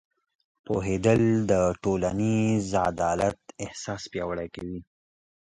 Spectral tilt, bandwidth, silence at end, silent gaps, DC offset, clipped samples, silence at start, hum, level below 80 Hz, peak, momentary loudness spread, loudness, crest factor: -6.5 dB/octave; 11 kHz; 0.75 s; none; under 0.1%; under 0.1%; 0.7 s; none; -48 dBFS; -8 dBFS; 14 LU; -26 LUFS; 20 dB